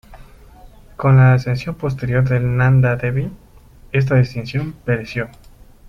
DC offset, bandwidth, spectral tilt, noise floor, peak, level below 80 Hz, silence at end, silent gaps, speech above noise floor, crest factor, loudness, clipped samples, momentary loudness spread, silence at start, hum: under 0.1%; 6.2 kHz; -8.5 dB/octave; -44 dBFS; -2 dBFS; -40 dBFS; 0 s; none; 28 dB; 16 dB; -17 LUFS; under 0.1%; 12 LU; 0.1 s; none